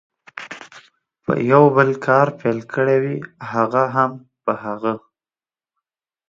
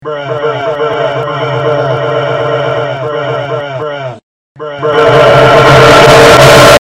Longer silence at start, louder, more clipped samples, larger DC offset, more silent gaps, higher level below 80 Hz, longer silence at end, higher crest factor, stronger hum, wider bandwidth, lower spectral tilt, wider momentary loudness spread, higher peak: first, 0.35 s vs 0 s; second, -18 LUFS vs -7 LUFS; second, under 0.1% vs 4%; neither; second, none vs 4.23-4.55 s; second, -64 dBFS vs -32 dBFS; first, 1.3 s vs 0.05 s; first, 20 dB vs 6 dB; neither; second, 7.4 kHz vs 18 kHz; first, -8 dB/octave vs -4.5 dB/octave; first, 20 LU vs 16 LU; about the same, 0 dBFS vs 0 dBFS